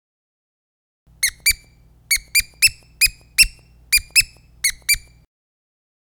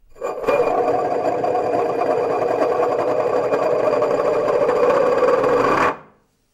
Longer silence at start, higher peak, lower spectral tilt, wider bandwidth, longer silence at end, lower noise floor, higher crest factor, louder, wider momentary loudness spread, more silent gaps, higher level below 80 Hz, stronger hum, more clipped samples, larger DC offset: first, 1.2 s vs 0.15 s; first, 0 dBFS vs -6 dBFS; second, 3 dB/octave vs -6 dB/octave; first, over 20 kHz vs 13 kHz; first, 1.05 s vs 0.5 s; about the same, -51 dBFS vs -54 dBFS; first, 22 dB vs 14 dB; about the same, -17 LUFS vs -18 LUFS; first, 7 LU vs 4 LU; neither; first, -40 dBFS vs -52 dBFS; neither; neither; neither